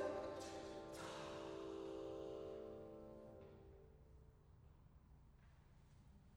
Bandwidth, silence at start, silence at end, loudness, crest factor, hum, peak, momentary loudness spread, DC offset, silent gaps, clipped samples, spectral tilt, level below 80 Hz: over 20 kHz; 0 s; 0 s; -53 LUFS; 20 dB; none; -34 dBFS; 18 LU; under 0.1%; none; under 0.1%; -5 dB/octave; -70 dBFS